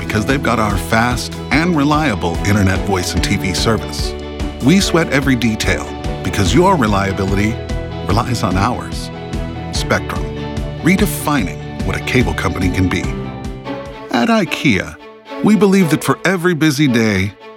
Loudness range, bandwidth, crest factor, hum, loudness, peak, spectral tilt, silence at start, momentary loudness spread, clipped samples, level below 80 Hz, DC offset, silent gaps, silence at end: 4 LU; 18 kHz; 14 dB; none; -16 LUFS; 0 dBFS; -5.5 dB/octave; 0 s; 11 LU; under 0.1%; -28 dBFS; under 0.1%; none; 0 s